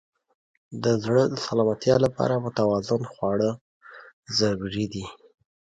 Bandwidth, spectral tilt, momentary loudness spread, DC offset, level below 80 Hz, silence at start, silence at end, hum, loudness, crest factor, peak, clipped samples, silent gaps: 9.2 kHz; -6 dB/octave; 10 LU; under 0.1%; -56 dBFS; 0.7 s; 0.65 s; none; -24 LUFS; 18 dB; -6 dBFS; under 0.1%; 3.61-3.81 s, 4.13-4.23 s